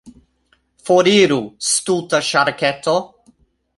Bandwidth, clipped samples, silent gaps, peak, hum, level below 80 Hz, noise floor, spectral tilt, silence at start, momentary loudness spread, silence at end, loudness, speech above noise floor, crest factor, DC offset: 11.5 kHz; under 0.1%; none; -2 dBFS; none; -58 dBFS; -62 dBFS; -3 dB/octave; 0.05 s; 7 LU; 0.7 s; -16 LUFS; 46 dB; 16 dB; under 0.1%